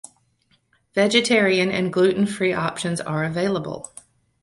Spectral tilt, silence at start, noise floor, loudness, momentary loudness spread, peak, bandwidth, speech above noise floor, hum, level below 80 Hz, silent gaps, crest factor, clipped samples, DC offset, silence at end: -4.5 dB/octave; 0.95 s; -64 dBFS; -21 LUFS; 11 LU; -2 dBFS; 11.5 kHz; 44 dB; none; -60 dBFS; none; 20 dB; under 0.1%; under 0.1%; 0.6 s